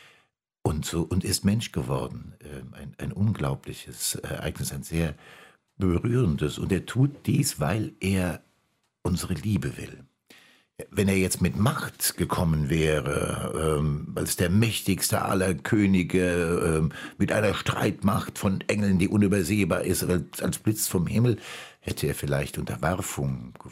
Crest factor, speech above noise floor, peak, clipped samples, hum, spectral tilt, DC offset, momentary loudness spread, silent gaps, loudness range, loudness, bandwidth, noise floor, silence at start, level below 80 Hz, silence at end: 18 dB; 46 dB; -8 dBFS; under 0.1%; none; -5.5 dB/octave; under 0.1%; 10 LU; none; 6 LU; -26 LUFS; 16 kHz; -72 dBFS; 0.65 s; -44 dBFS; 0 s